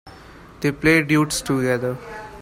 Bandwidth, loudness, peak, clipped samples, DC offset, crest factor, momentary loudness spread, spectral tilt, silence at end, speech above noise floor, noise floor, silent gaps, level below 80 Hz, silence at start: 16 kHz; -20 LUFS; -4 dBFS; under 0.1%; under 0.1%; 16 dB; 13 LU; -5 dB/octave; 0 s; 23 dB; -43 dBFS; none; -46 dBFS; 0.05 s